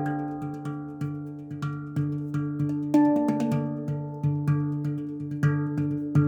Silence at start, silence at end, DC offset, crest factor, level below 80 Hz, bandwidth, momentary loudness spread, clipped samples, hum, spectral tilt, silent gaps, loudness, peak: 0 s; 0 s; under 0.1%; 16 dB; -66 dBFS; 8.6 kHz; 11 LU; under 0.1%; none; -9.5 dB/octave; none; -28 LUFS; -10 dBFS